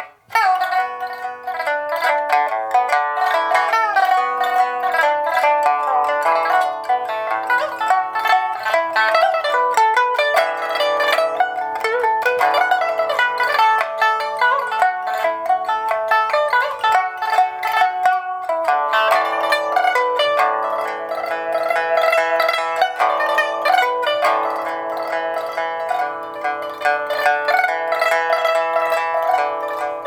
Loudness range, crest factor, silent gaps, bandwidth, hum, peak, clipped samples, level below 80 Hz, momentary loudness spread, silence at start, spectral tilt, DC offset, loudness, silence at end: 2 LU; 16 dB; none; over 20 kHz; none; -2 dBFS; under 0.1%; -70 dBFS; 6 LU; 0 s; -1 dB/octave; under 0.1%; -18 LUFS; 0 s